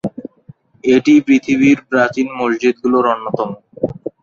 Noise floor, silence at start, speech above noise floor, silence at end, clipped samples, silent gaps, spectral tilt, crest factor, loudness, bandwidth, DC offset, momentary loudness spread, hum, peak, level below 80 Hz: -44 dBFS; 0.05 s; 30 dB; 0.15 s; under 0.1%; none; -6 dB/octave; 14 dB; -15 LUFS; 7.4 kHz; under 0.1%; 13 LU; none; -2 dBFS; -54 dBFS